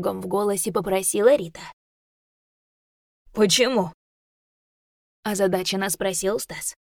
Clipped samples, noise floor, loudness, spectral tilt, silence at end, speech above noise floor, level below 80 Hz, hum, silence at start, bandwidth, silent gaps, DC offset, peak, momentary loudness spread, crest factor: under 0.1%; under -90 dBFS; -22 LUFS; -3 dB/octave; 0.15 s; over 67 dB; -58 dBFS; none; 0 s; over 20 kHz; 1.73-3.25 s, 3.94-5.23 s; under 0.1%; -4 dBFS; 15 LU; 20 dB